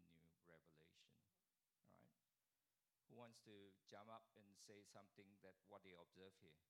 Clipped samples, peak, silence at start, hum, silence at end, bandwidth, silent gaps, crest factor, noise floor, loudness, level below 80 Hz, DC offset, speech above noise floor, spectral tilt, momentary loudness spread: under 0.1%; -48 dBFS; 0 s; none; 0.05 s; 11.5 kHz; none; 22 dB; under -90 dBFS; -67 LUFS; under -90 dBFS; under 0.1%; over 22 dB; -4 dB/octave; 5 LU